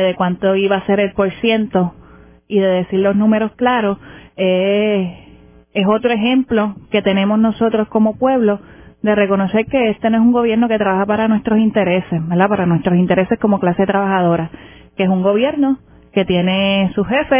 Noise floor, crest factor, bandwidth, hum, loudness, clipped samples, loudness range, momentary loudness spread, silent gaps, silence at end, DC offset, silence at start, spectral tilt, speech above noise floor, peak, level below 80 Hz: -44 dBFS; 16 dB; 3.6 kHz; none; -15 LUFS; under 0.1%; 2 LU; 6 LU; none; 0 s; under 0.1%; 0 s; -11 dB/octave; 29 dB; 0 dBFS; -46 dBFS